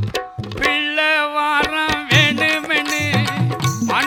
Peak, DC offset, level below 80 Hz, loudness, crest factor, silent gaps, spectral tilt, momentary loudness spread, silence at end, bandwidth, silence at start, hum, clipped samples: 0 dBFS; under 0.1%; -44 dBFS; -17 LUFS; 18 dB; none; -4 dB/octave; 7 LU; 0 s; 18 kHz; 0 s; none; under 0.1%